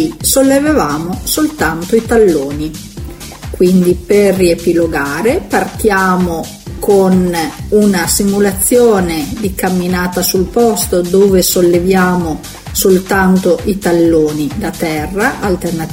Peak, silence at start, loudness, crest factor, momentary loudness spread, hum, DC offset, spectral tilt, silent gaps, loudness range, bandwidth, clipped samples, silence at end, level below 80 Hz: 0 dBFS; 0 s; -12 LUFS; 12 dB; 9 LU; none; under 0.1%; -5 dB/octave; none; 2 LU; 16.5 kHz; under 0.1%; 0 s; -30 dBFS